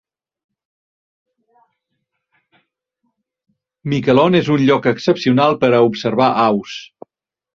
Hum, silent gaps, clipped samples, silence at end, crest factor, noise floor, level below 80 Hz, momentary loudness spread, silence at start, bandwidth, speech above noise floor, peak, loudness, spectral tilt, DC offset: none; none; under 0.1%; 0.7 s; 16 dB; -74 dBFS; -56 dBFS; 9 LU; 3.85 s; 7.2 kHz; 60 dB; -2 dBFS; -15 LUFS; -7 dB/octave; under 0.1%